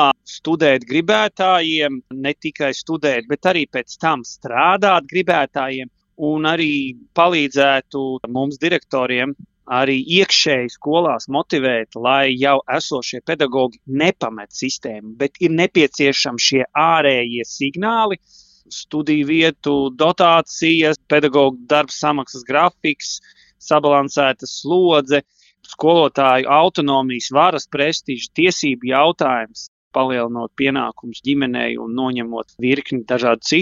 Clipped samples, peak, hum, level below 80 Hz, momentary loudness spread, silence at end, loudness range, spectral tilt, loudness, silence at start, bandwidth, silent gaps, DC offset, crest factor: under 0.1%; 0 dBFS; none; -60 dBFS; 10 LU; 0 s; 3 LU; -4 dB/octave; -17 LUFS; 0 s; 7.8 kHz; 29.68-29.91 s; under 0.1%; 18 dB